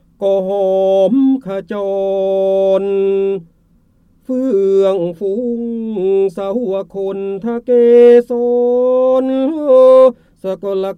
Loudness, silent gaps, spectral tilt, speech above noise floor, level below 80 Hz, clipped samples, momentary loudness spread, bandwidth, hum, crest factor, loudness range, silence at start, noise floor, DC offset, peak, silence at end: -13 LUFS; none; -8 dB/octave; 40 dB; -56 dBFS; under 0.1%; 13 LU; 6.2 kHz; none; 12 dB; 6 LU; 0.2 s; -53 dBFS; under 0.1%; 0 dBFS; 0.05 s